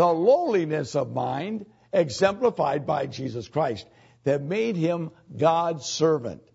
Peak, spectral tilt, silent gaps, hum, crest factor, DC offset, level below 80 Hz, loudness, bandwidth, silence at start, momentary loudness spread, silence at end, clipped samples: -8 dBFS; -5.5 dB/octave; none; none; 18 dB; under 0.1%; -64 dBFS; -25 LUFS; 8 kHz; 0 s; 10 LU; 0.2 s; under 0.1%